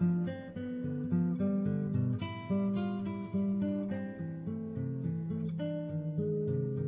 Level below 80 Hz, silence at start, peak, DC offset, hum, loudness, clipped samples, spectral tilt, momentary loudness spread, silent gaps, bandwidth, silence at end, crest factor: -58 dBFS; 0 s; -20 dBFS; under 0.1%; none; -35 LUFS; under 0.1%; -9 dB/octave; 7 LU; none; 3.9 kHz; 0 s; 14 dB